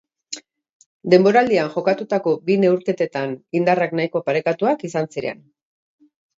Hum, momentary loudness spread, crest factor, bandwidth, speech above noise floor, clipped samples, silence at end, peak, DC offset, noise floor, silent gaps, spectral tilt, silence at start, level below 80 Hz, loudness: none; 18 LU; 20 dB; 7.8 kHz; 19 dB; under 0.1%; 1.05 s; 0 dBFS; under 0.1%; -38 dBFS; 0.72-0.80 s, 0.86-1.00 s; -6 dB/octave; 0.3 s; -66 dBFS; -19 LUFS